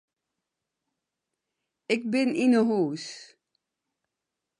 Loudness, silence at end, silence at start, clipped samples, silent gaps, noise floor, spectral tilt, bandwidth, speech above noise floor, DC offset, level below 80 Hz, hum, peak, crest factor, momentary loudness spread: -25 LUFS; 1.35 s; 1.9 s; under 0.1%; none; -86 dBFS; -5.5 dB/octave; 10.5 kHz; 61 dB; under 0.1%; -80 dBFS; none; -10 dBFS; 20 dB; 16 LU